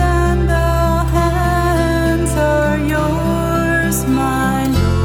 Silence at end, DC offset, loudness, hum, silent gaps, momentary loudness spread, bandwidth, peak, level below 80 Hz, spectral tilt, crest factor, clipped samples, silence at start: 0 s; under 0.1%; -15 LUFS; none; none; 2 LU; 17 kHz; -4 dBFS; -22 dBFS; -6 dB/octave; 12 dB; under 0.1%; 0 s